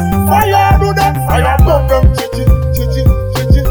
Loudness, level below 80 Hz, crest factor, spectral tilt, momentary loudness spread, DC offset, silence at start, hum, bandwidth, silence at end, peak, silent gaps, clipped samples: -11 LUFS; -14 dBFS; 10 dB; -6.5 dB/octave; 4 LU; 0.4%; 0 s; none; over 20 kHz; 0 s; 0 dBFS; none; under 0.1%